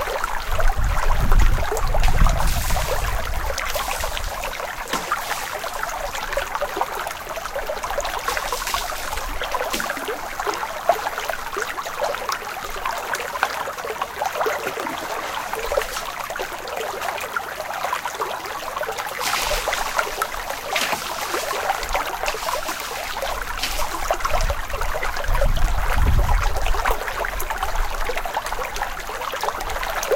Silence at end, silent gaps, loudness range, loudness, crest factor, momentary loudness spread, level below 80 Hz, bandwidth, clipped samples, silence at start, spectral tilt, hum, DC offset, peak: 0 s; none; 3 LU; -25 LUFS; 22 dB; 6 LU; -26 dBFS; 17 kHz; under 0.1%; 0 s; -3 dB/octave; none; under 0.1%; 0 dBFS